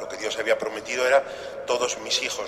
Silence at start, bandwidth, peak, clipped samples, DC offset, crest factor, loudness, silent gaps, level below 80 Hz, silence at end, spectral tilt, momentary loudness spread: 0 s; 14.5 kHz; -6 dBFS; under 0.1%; under 0.1%; 18 dB; -25 LUFS; none; -62 dBFS; 0 s; -1 dB/octave; 9 LU